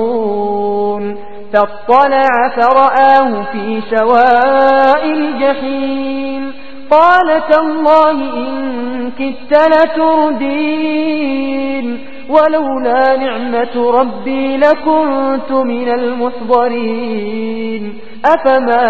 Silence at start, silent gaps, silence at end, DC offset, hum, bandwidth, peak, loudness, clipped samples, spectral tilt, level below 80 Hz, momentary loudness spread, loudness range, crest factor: 0 s; none; 0 s; 5%; none; 8 kHz; 0 dBFS; -12 LUFS; 0.4%; -6.5 dB/octave; -52 dBFS; 11 LU; 4 LU; 12 dB